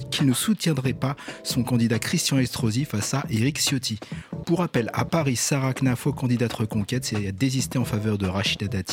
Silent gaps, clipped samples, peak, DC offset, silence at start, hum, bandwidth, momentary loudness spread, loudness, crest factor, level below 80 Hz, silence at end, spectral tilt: none; under 0.1%; -8 dBFS; under 0.1%; 0 s; none; 17 kHz; 5 LU; -24 LUFS; 16 dB; -52 dBFS; 0 s; -4.5 dB/octave